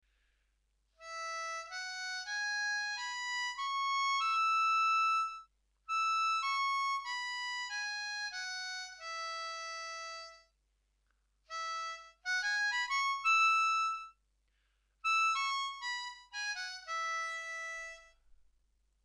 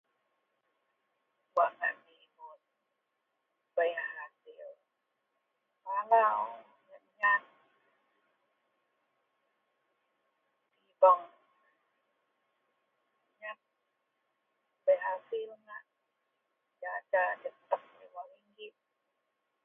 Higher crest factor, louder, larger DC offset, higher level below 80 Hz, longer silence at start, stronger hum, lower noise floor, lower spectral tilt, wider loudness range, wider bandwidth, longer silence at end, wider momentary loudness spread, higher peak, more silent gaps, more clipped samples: second, 16 dB vs 26 dB; second, -34 LUFS vs -31 LUFS; neither; first, -76 dBFS vs under -90 dBFS; second, 1 s vs 1.55 s; neither; second, -77 dBFS vs -83 dBFS; second, 4.5 dB/octave vs 1.5 dB/octave; about the same, 9 LU vs 8 LU; first, 12.5 kHz vs 3.8 kHz; about the same, 0.95 s vs 0.95 s; second, 14 LU vs 26 LU; second, -20 dBFS vs -12 dBFS; neither; neither